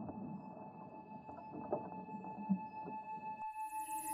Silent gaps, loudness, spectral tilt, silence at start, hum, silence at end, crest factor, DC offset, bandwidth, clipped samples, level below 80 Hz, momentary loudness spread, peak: none; -46 LUFS; -6.5 dB/octave; 0 s; none; 0 s; 20 dB; under 0.1%; 16 kHz; under 0.1%; -78 dBFS; 12 LU; -24 dBFS